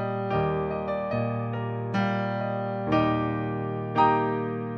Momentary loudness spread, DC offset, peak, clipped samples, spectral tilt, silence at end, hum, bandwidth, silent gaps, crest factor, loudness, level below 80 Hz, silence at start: 7 LU; under 0.1%; -8 dBFS; under 0.1%; -9 dB/octave; 0 s; none; 6.2 kHz; none; 18 dB; -27 LUFS; -52 dBFS; 0 s